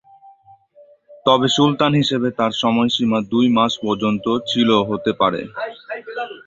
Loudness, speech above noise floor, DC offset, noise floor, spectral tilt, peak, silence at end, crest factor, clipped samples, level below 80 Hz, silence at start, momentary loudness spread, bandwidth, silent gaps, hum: -18 LUFS; 33 dB; under 0.1%; -50 dBFS; -5.5 dB/octave; -2 dBFS; 0.1 s; 18 dB; under 0.1%; -56 dBFS; 1.1 s; 13 LU; 7.8 kHz; none; none